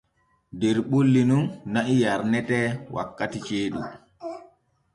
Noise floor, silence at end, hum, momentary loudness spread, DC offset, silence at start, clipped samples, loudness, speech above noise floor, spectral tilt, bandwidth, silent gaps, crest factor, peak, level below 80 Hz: -64 dBFS; 0.5 s; none; 18 LU; under 0.1%; 0.55 s; under 0.1%; -24 LUFS; 41 dB; -6.5 dB/octave; 11.5 kHz; none; 14 dB; -10 dBFS; -58 dBFS